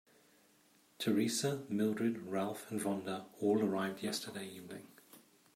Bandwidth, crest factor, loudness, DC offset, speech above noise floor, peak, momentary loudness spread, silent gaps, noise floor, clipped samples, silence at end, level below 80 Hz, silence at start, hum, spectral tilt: 16 kHz; 16 dB; -37 LUFS; under 0.1%; 32 dB; -22 dBFS; 14 LU; none; -69 dBFS; under 0.1%; 0.35 s; -84 dBFS; 1 s; none; -4.5 dB/octave